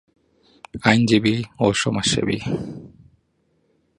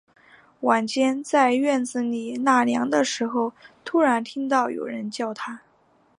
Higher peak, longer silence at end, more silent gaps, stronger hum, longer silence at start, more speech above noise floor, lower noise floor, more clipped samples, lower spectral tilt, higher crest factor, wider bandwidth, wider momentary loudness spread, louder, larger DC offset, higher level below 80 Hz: first, 0 dBFS vs -4 dBFS; first, 1.1 s vs 0.6 s; neither; neither; first, 0.75 s vs 0.6 s; first, 46 dB vs 38 dB; first, -66 dBFS vs -61 dBFS; neither; about the same, -4.5 dB/octave vs -3.5 dB/octave; about the same, 22 dB vs 18 dB; about the same, 11 kHz vs 11 kHz; first, 17 LU vs 10 LU; first, -20 LUFS vs -23 LUFS; neither; first, -50 dBFS vs -76 dBFS